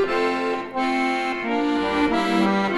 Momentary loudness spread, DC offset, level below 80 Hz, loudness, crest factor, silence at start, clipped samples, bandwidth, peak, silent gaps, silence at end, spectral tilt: 4 LU; under 0.1%; -50 dBFS; -22 LUFS; 14 dB; 0 s; under 0.1%; 12 kHz; -8 dBFS; none; 0 s; -5.5 dB/octave